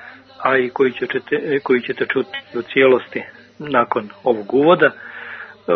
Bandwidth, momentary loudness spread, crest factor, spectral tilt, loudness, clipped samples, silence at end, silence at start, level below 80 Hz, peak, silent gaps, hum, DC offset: 5.6 kHz; 17 LU; 18 dB; -8 dB/octave; -18 LUFS; under 0.1%; 0 s; 0 s; -64 dBFS; 0 dBFS; none; none; under 0.1%